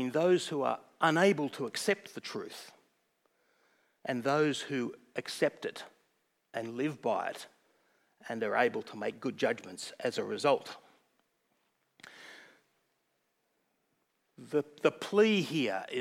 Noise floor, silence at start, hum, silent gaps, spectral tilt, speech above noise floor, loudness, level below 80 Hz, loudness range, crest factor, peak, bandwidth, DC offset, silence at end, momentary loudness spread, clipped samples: -79 dBFS; 0 s; none; none; -4.5 dB/octave; 47 dB; -32 LUFS; under -90 dBFS; 5 LU; 22 dB; -12 dBFS; 16 kHz; under 0.1%; 0 s; 20 LU; under 0.1%